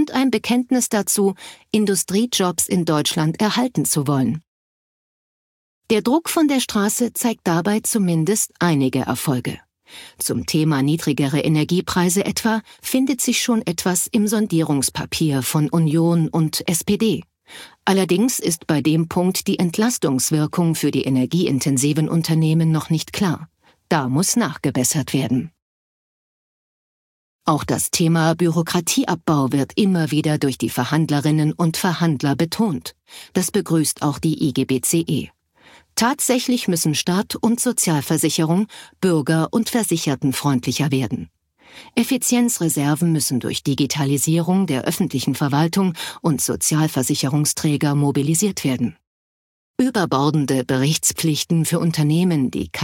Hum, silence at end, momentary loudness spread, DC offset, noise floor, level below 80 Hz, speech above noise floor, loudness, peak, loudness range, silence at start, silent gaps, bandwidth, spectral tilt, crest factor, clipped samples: none; 0 s; 5 LU; under 0.1%; -51 dBFS; -54 dBFS; 32 dB; -19 LUFS; -4 dBFS; 3 LU; 0 s; 4.48-5.82 s, 25.62-27.39 s, 49.07-49.74 s; 17 kHz; -4.5 dB/octave; 16 dB; under 0.1%